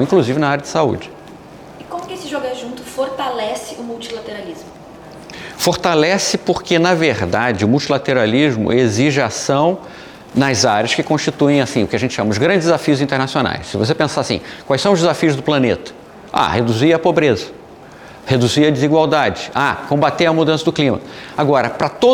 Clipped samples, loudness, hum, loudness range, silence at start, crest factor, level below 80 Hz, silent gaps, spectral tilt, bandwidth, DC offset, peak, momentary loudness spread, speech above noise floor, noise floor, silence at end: under 0.1%; -16 LUFS; none; 8 LU; 0 s; 14 dB; -50 dBFS; none; -5 dB/octave; 18.5 kHz; under 0.1%; -2 dBFS; 14 LU; 22 dB; -38 dBFS; 0 s